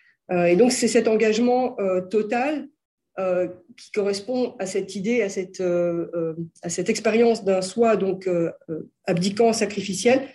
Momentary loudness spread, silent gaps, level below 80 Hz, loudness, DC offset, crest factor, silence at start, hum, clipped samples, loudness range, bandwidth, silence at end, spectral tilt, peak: 10 LU; 2.85-2.98 s; -68 dBFS; -22 LUFS; under 0.1%; 16 dB; 0.3 s; none; under 0.1%; 4 LU; 12.5 kHz; 0.05 s; -5 dB/octave; -6 dBFS